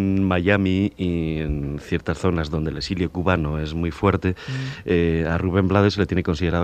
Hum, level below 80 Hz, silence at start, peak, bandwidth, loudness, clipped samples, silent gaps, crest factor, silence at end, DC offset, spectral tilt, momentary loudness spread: none; -36 dBFS; 0 s; -2 dBFS; 9 kHz; -22 LUFS; under 0.1%; none; 18 dB; 0 s; under 0.1%; -7.5 dB/octave; 8 LU